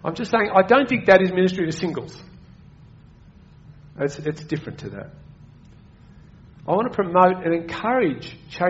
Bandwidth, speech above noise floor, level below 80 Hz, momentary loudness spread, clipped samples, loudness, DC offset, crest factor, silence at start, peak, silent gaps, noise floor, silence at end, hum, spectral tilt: 8 kHz; 27 dB; -54 dBFS; 20 LU; under 0.1%; -20 LUFS; under 0.1%; 22 dB; 0.05 s; -2 dBFS; none; -48 dBFS; 0 s; none; -4.5 dB/octave